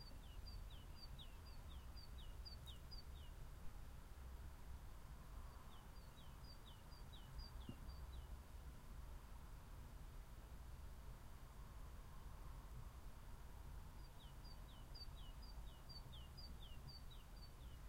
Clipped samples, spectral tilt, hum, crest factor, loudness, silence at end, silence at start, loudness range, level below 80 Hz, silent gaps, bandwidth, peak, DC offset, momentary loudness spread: under 0.1%; -5 dB/octave; none; 16 dB; -59 LUFS; 0 s; 0 s; 2 LU; -58 dBFS; none; 16 kHz; -40 dBFS; under 0.1%; 4 LU